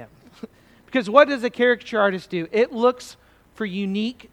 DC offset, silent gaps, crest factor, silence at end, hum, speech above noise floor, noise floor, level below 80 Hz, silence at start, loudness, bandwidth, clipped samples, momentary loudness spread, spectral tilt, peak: under 0.1%; none; 22 dB; 0.2 s; none; 22 dB; -43 dBFS; -62 dBFS; 0 s; -21 LUFS; 12.5 kHz; under 0.1%; 13 LU; -5.5 dB/octave; 0 dBFS